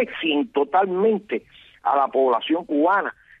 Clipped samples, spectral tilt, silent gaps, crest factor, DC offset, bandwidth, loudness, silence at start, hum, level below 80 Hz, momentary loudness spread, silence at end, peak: under 0.1%; -7.5 dB/octave; none; 12 dB; under 0.1%; 4.1 kHz; -22 LUFS; 0 s; none; -66 dBFS; 9 LU; 0.3 s; -8 dBFS